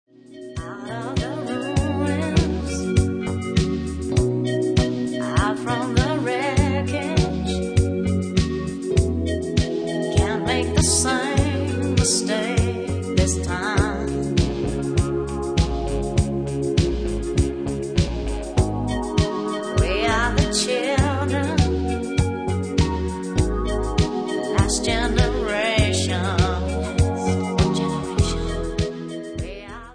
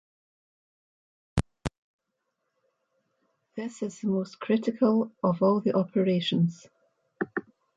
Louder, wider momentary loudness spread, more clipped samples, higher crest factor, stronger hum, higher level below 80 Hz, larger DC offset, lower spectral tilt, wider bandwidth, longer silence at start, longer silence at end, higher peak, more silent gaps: first, -22 LUFS vs -28 LUFS; second, 6 LU vs 13 LU; neither; about the same, 18 dB vs 20 dB; neither; first, -30 dBFS vs -52 dBFS; neither; second, -5 dB/octave vs -7 dB/octave; about the same, 10.5 kHz vs 11 kHz; second, 0.3 s vs 1.35 s; second, 0 s vs 0.35 s; first, -4 dBFS vs -10 dBFS; second, none vs 1.78-1.99 s